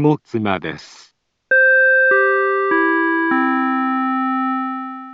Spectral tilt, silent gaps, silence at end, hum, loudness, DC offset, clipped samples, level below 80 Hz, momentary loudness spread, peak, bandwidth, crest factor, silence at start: -7 dB/octave; none; 0 s; none; -16 LUFS; under 0.1%; under 0.1%; -64 dBFS; 12 LU; -4 dBFS; 7.6 kHz; 14 dB; 0 s